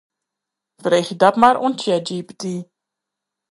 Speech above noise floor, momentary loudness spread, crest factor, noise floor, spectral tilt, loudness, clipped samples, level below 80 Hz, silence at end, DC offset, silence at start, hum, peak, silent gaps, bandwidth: 66 dB; 15 LU; 20 dB; -83 dBFS; -5 dB/octave; -18 LUFS; under 0.1%; -64 dBFS; 0.85 s; under 0.1%; 0.85 s; 50 Hz at -55 dBFS; 0 dBFS; none; 11.5 kHz